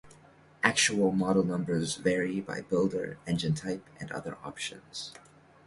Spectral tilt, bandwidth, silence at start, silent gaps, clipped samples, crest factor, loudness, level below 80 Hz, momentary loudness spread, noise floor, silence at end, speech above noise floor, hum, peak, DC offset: -4 dB/octave; 11.5 kHz; 0.05 s; none; under 0.1%; 24 dB; -30 LUFS; -62 dBFS; 15 LU; -57 dBFS; 0.45 s; 27 dB; none; -6 dBFS; under 0.1%